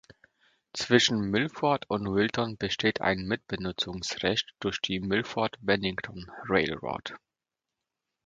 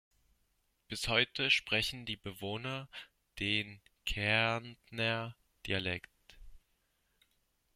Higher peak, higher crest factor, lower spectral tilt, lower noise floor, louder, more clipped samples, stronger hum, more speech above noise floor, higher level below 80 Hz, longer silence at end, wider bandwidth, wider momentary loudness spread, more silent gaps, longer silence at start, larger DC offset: first, -6 dBFS vs -14 dBFS; about the same, 24 dB vs 24 dB; about the same, -4.5 dB/octave vs -3.5 dB/octave; first, -89 dBFS vs -77 dBFS; first, -28 LUFS vs -34 LUFS; neither; neither; first, 60 dB vs 42 dB; about the same, -56 dBFS vs -58 dBFS; about the same, 1.1 s vs 1.15 s; second, 9.4 kHz vs 16 kHz; second, 11 LU vs 17 LU; neither; second, 0.75 s vs 0.9 s; neither